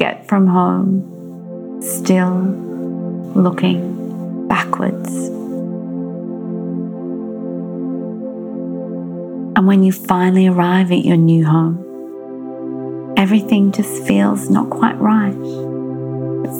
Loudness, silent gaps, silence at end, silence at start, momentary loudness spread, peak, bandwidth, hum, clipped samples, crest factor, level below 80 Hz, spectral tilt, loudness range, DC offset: -17 LUFS; none; 0 s; 0 s; 13 LU; 0 dBFS; 17 kHz; none; under 0.1%; 16 dB; -58 dBFS; -7 dB/octave; 10 LU; under 0.1%